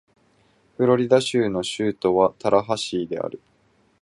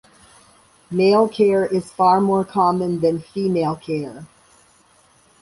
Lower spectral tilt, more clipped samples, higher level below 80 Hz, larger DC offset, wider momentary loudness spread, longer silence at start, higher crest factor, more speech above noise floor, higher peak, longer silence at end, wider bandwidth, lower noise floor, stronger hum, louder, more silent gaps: second, -5.5 dB/octave vs -7 dB/octave; neither; about the same, -58 dBFS vs -58 dBFS; neither; about the same, 10 LU vs 11 LU; about the same, 0.8 s vs 0.9 s; about the same, 20 dB vs 16 dB; first, 41 dB vs 37 dB; about the same, -4 dBFS vs -4 dBFS; second, 0.65 s vs 1.15 s; about the same, 11.5 kHz vs 11.5 kHz; first, -62 dBFS vs -55 dBFS; neither; second, -22 LUFS vs -19 LUFS; neither